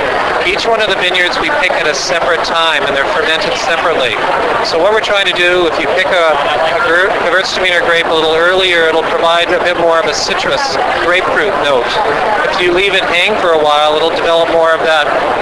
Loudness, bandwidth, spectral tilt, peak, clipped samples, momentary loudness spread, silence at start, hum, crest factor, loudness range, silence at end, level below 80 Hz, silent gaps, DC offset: -10 LUFS; 11 kHz; -2.5 dB/octave; 0 dBFS; under 0.1%; 3 LU; 0 s; none; 10 dB; 1 LU; 0 s; -40 dBFS; none; under 0.1%